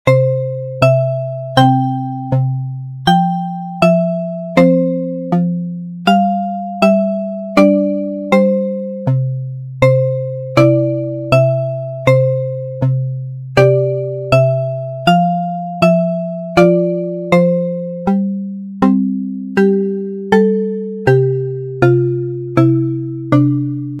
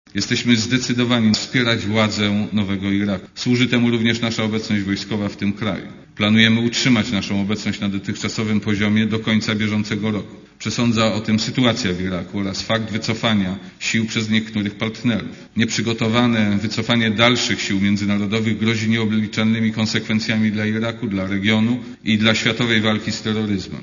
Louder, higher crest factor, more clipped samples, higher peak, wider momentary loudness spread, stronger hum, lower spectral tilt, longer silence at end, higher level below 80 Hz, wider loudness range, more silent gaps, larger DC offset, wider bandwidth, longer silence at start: first, -15 LUFS vs -19 LUFS; second, 14 dB vs 20 dB; neither; about the same, 0 dBFS vs 0 dBFS; about the same, 9 LU vs 8 LU; neither; first, -8 dB/octave vs -5 dB/octave; about the same, 0 s vs 0 s; about the same, -48 dBFS vs -52 dBFS; about the same, 1 LU vs 3 LU; neither; neither; first, 11 kHz vs 7.4 kHz; about the same, 0.05 s vs 0.15 s